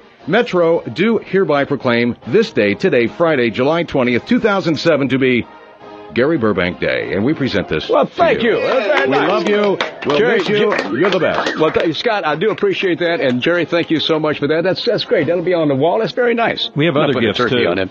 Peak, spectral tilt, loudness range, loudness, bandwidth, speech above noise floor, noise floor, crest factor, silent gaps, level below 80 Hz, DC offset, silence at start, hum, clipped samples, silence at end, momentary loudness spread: 0 dBFS; -6.5 dB/octave; 2 LU; -15 LUFS; 7.8 kHz; 21 dB; -36 dBFS; 14 dB; none; -50 dBFS; under 0.1%; 0.25 s; none; under 0.1%; 0 s; 3 LU